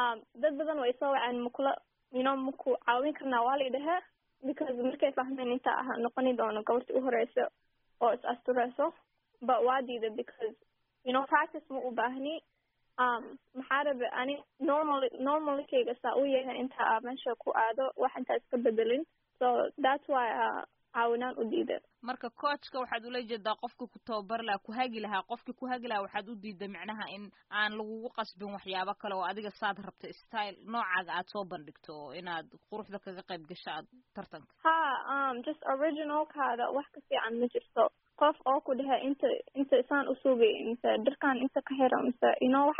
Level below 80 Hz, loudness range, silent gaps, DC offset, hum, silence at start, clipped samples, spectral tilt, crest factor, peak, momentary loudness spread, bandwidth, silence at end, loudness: -78 dBFS; 7 LU; none; under 0.1%; none; 0 s; under 0.1%; -1.5 dB/octave; 20 dB; -12 dBFS; 13 LU; 5.4 kHz; 0 s; -33 LUFS